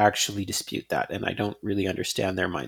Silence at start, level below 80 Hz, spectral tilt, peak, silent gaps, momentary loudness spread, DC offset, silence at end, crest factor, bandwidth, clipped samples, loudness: 0 s; -60 dBFS; -3.5 dB/octave; -6 dBFS; none; 4 LU; under 0.1%; 0 s; 22 dB; 19 kHz; under 0.1%; -27 LUFS